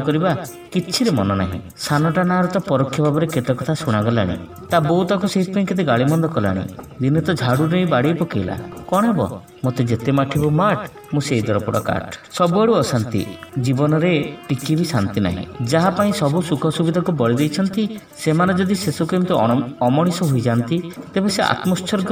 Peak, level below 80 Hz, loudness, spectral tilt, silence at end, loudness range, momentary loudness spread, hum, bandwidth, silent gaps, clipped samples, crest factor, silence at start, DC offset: 0 dBFS; -50 dBFS; -19 LUFS; -6.5 dB/octave; 0 s; 1 LU; 8 LU; none; 17.5 kHz; none; under 0.1%; 18 dB; 0 s; under 0.1%